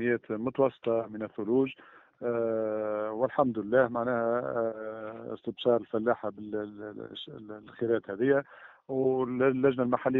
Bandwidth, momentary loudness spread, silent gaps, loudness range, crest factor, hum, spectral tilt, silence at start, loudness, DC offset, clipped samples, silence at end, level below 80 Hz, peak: 4 kHz; 14 LU; none; 3 LU; 20 dB; none; -5.5 dB/octave; 0 s; -30 LUFS; under 0.1%; under 0.1%; 0 s; -70 dBFS; -10 dBFS